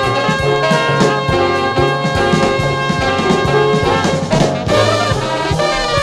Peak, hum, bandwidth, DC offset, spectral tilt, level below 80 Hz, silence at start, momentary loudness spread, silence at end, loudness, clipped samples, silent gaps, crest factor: 0 dBFS; none; 13.5 kHz; under 0.1%; -5 dB/octave; -32 dBFS; 0 s; 3 LU; 0 s; -14 LUFS; under 0.1%; none; 14 dB